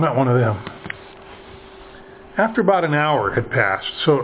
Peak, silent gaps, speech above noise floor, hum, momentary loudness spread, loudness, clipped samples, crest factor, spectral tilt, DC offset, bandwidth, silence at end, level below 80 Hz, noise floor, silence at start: -2 dBFS; none; 23 dB; none; 23 LU; -19 LUFS; under 0.1%; 18 dB; -10 dB/octave; under 0.1%; 4 kHz; 0 s; -50 dBFS; -41 dBFS; 0 s